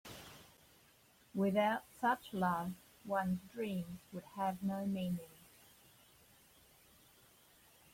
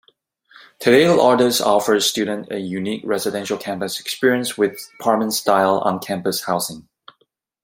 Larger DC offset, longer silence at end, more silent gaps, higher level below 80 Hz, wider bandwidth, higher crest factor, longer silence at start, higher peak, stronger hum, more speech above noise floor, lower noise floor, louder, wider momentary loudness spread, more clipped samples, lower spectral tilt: neither; first, 2.6 s vs 0.8 s; neither; second, -74 dBFS vs -62 dBFS; about the same, 16.5 kHz vs 16.5 kHz; about the same, 20 dB vs 18 dB; second, 0.05 s vs 0.8 s; second, -22 dBFS vs 0 dBFS; neither; second, 30 dB vs 47 dB; about the same, -68 dBFS vs -66 dBFS; second, -39 LUFS vs -19 LUFS; first, 19 LU vs 11 LU; neither; first, -6.5 dB/octave vs -3.5 dB/octave